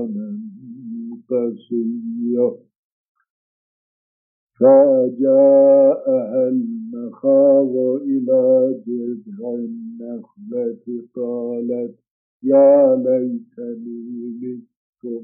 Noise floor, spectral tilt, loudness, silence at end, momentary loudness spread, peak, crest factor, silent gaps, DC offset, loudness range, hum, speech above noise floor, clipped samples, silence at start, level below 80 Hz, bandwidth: under -90 dBFS; -7 dB/octave; -17 LUFS; 0 s; 20 LU; -2 dBFS; 16 dB; 2.76-3.15 s, 3.30-4.47 s, 12.11-12.40 s, 14.76-14.93 s; under 0.1%; 10 LU; none; over 73 dB; under 0.1%; 0 s; -82 dBFS; 2.5 kHz